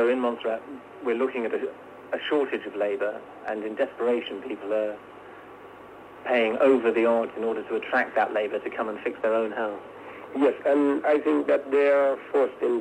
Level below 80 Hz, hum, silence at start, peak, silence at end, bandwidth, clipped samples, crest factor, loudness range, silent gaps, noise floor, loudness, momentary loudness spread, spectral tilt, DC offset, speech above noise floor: -72 dBFS; none; 0 s; -10 dBFS; 0 s; 9 kHz; under 0.1%; 16 dB; 5 LU; none; -45 dBFS; -26 LUFS; 20 LU; -5.5 dB/octave; under 0.1%; 20 dB